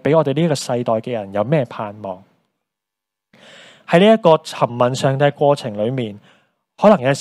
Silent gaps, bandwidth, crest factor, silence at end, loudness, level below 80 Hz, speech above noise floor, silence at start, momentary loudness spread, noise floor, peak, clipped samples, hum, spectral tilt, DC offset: none; 13 kHz; 18 dB; 0 s; -17 LUFS; -62 dBFS; 67 dB; 0.05 s; 15 LU; -84 dBFS; 0 dBFS; under 0.1%; none; -6 dB/octave; under 0.1%